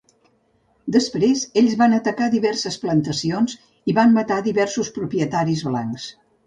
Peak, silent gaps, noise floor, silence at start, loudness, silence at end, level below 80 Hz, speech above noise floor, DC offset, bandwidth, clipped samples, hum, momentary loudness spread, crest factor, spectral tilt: -4 dBFS; none; -62 dBFS; 0.85 s; -20 LUFS; 0.35 s; -58 dBFS; 43 dB; under 0.1%; 9.4 kHz; under 0.1%; none; 9 LU; 16 dB; -5.5 dB/octave